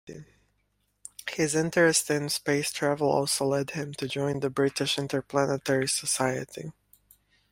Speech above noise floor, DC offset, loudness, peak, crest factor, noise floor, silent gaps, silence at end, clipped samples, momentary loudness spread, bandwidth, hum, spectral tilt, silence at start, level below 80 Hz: 46 dB; under 0.1%; -27 LUFS; -8 dBFS; 20 dB; -73 dBFS; none; 0.8 s; under 0.1%; 17 LU; 16.5 kHz; 50 Hz at -55 dBFS; -3.5 dB/octave; 0.05 s; -64 dBFS